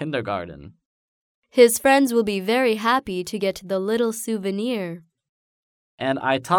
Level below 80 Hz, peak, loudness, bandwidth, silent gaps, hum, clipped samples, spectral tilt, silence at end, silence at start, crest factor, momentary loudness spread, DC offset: -58 dBFS; -2 dBFS; -21 LUFS; over 20 kHz; 0.85-1.42 s, 5.29-5.98 s; none; under 0.1%; -4 dB/octave; 0 s; 0 s; 20 dB; 12 LU; under 0.1%